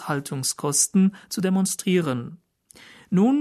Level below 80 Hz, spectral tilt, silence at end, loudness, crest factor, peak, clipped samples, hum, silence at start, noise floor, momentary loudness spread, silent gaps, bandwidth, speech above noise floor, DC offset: -68 dBFS; -4.5 dB/octave; 0 s; -23 LUFS; 16 dB; -6 dBFS; under 0.1%; none; 0 s; -51 dBFS; 9 LU; none; 13.5 kHz; 29 dB; under 0.1%